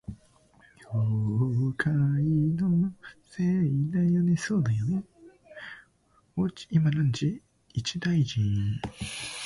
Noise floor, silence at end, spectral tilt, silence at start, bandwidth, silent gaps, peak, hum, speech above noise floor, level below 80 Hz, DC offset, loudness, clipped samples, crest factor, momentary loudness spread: -65 dBFS; 0 s; -6.5 dB/octave; 0.1 s; 11.5 kHz; none; -12 dBFS; none; 39 dB; -54 dBFS; under 0.1%; -27 LUFS; under 0.1%; 16 dB; 13 LU